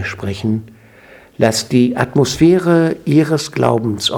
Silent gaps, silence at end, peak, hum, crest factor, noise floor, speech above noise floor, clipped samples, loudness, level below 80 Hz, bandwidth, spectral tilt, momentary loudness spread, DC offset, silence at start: none; 0 s; 0 dBFS; none; 14 dB; -43 dBFS; 29 dB; under 0.1%; -15 LUFS; -46 dBFS; 17.5 kHz; -5.5 dB/octave; 9 LU; under 0.1%; 0 s